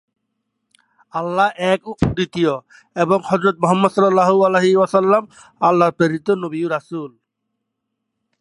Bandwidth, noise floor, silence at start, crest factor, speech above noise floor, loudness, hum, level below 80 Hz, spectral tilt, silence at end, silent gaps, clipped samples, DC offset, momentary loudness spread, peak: 11.5 kHz; -77 dBFS; 1.15 s; 18 dB; 60 dB; -17 LUFS; none; -46 dBFS; -6.5 dB/octave; 1.3 s; none; under 0.1%; under 0.1%; 12 LU; 0 dBFS